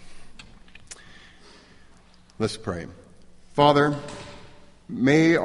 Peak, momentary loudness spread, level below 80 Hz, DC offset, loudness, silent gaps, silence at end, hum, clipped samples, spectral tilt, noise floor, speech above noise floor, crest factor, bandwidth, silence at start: -4 dBFS; 25 LU; -52 dBFS; under 0.1%; -23 LUFS; none; 0 s; none; under 0.1%; -6 dB/octave; -52 dBFS; 31 dB; 22 dB; 11.5 kHz; 0 s